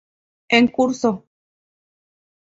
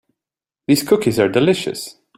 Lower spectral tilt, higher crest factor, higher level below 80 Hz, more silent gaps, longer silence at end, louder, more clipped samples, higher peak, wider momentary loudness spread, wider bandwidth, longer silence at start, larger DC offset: about the same, -4.5 dB/octave vs -5 dB/octave; about the same, 20 dB vs 18 dB; about the same, -60 dBFS vs -56 dBFS; neither; first, 1.35 s vs 0.25 s; about the same, -18 LUFS vs -17 LUFS; neither; about the same, -2 dBFS vs -2 dBFS; second, 8 LU vs 13 LU; second, 7.8 kHz vs 16 kHz; second, 0.5 s vs 0.7 s; neither